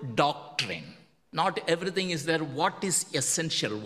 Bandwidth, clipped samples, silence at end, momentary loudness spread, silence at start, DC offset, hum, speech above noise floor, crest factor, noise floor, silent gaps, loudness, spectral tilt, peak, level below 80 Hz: 15.5 kHz; under 0.1%; 0 s; 7 LU; 0 s; under 0.1%; none; 23 dB; 22 dB; -51 dBFS; none; -28 LUFS; -3 dB/octave; -8 dBFS; -68 dBFS